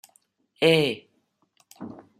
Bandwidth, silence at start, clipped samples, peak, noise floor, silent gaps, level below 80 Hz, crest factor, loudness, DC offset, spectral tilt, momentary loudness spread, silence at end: 15 kHz; 0.6 s; under 0.1%; -4 dBFS; -70 dBFS; none; -70 dBFS; 22 dB; -22 LUFS; under 0.1%; -5 dB/octave; 22 LU; 0.25 s